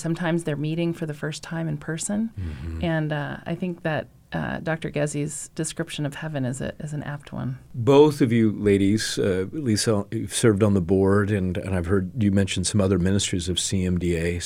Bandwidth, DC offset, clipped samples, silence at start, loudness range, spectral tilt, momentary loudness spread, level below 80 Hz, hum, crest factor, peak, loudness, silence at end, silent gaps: 16 kHz; under 0.1%; under 0.1%; 0 s; 7 LU; -5.5 dB/octave; 11 LU; -46 dBFS; none; 18 dB; -4 dBFS; -24 LUFS; 0 s; none